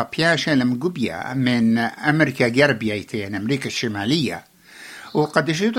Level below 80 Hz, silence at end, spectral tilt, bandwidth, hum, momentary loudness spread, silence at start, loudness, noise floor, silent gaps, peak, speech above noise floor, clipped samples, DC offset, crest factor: -58 dBFS; 0 s; -5.5 dB/octave; 16 kHz; none; 9 LU; 0 s; -20 LUFS; -42 dBFS; none; -2 dBFS; 22 dB; under 0.1%; under 0.1%; 18 dB